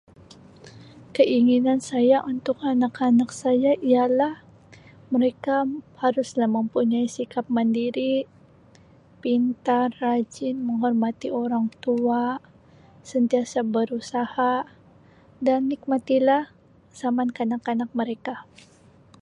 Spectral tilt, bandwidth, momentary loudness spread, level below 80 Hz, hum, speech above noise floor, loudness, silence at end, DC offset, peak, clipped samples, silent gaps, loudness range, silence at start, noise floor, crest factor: -5.5 dB/octave; 10.5 kHz; 9 LU; -66 dBFS; none; 30 dB; -23 LUFS; 0.8 s; under 0.1%; -6 dBFS; under 0.1%; none; 4 LU; 0.65 s; -53 dBFS; 18 dB